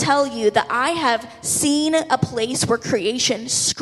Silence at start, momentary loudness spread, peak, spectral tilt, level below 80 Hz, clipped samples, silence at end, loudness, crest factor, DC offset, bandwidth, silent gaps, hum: 0 s; 4 LU; -2 dBFS; -3 dB/octave; -54 dBFS; under 0.1%; 0 s; -19 LUFS; 18 dB; under 0.1%; 14 kHz; none; none